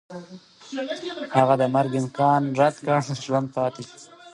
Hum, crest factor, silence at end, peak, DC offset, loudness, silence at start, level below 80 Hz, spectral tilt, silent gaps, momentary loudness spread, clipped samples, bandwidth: none; 20 dB; 0.05 s; -2 dBFS; under 0.1%; -23 LUFS; 0.1 s; -70 dBFS; -6.5 dB/octave; none; 17 LU; under 0.1%; 11.5 kHz